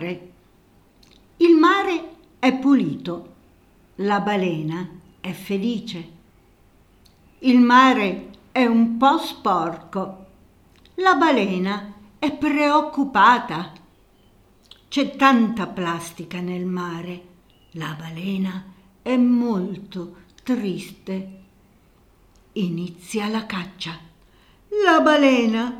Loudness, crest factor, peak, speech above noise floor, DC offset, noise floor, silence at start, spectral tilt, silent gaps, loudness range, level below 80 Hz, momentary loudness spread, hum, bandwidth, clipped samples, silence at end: -20 LUFS; 20 dB; -2 dBFS; 35 dB; under 0.1%; -55 dBFS; 0 s; -5.5 dB/octave; none; 11 LU; -58 dBFS; 19 LU; none; 14 kHz; under 0.1%; 0 s